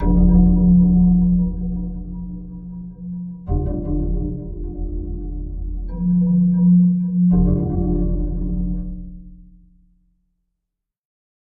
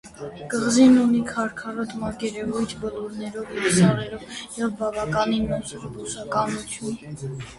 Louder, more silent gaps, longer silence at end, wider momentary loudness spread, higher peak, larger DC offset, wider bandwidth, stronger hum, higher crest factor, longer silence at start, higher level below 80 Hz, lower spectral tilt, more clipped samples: first, -18 LUFS vs -23 LUFS; neither; first, 2 s vs 0 s; about the same, 18 LU vs 16 LU; first, -2 dBFS vs -6 dBFS; neither; second, 1.6 kHz vs 11.5 kHz; neither; about the same, 16 dB vs 18 dB; about the same, 0 s vs 0.05 s; first, -24 dBFS vs -50 dBFS; first, -16 dB/octave vs -5 dB/octave; neither